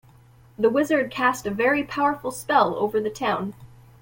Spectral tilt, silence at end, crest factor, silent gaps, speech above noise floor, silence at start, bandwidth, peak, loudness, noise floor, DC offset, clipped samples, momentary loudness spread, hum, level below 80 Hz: -4.5 dB/octave; 0.35 s; 18 dB; none; 29 dB; 0.6 s; 17 kHz; -6 dBFS; -23 LUFS; -52 dBFS; under 0.1%; under 0.1%; 5 LU; none; -56 dBFS